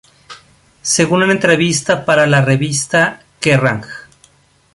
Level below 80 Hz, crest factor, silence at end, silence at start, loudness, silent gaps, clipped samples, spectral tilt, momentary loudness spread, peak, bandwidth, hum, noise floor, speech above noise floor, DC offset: -50 dBFS; 14 dB; 0.75 s; 0.3 s; -13 LUFS; none; under 0.1%; -4 dB/octave; 11 LU; 0 dBFS; 11.5 kHz; none; -51 dBFS; 38 dB; under 0.1%